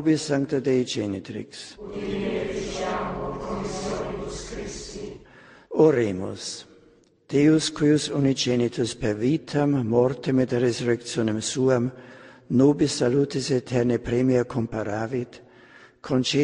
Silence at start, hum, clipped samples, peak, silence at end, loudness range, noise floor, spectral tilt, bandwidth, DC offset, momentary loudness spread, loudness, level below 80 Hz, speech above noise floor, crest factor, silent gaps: 0 s; none; under 0.1%; -6 dBFS; 0 s; 7 LU; -57 dBFS; -5.5 dB/octave; 10.5 kHz; under 0.1%; 14 LU; -24 LUFS; -50 dBFS; 34 dB; 18 dB; none